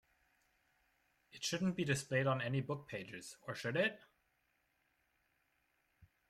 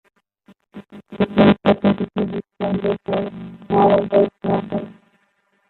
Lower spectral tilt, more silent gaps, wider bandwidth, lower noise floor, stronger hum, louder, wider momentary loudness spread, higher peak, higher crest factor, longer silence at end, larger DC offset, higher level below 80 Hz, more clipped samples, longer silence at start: second, -5 dB/octave vs -10 dB/octave; neither; first, 15 kHz vs 4.3 kHz; first, -80 dBFS vs -64 dBFS; neither; second, -39 LUFS vs -19 LUFS; second, 12 LU vs 20 LU; second, -22 dBFS vs -2 dBFS; about the same, 20 dB vs 18 dB; second, 0.25 s vs 0.75 s; neither; second, -76 dBFS vs -52 dBFS; neither; first, 1.35 s vs 0.75 s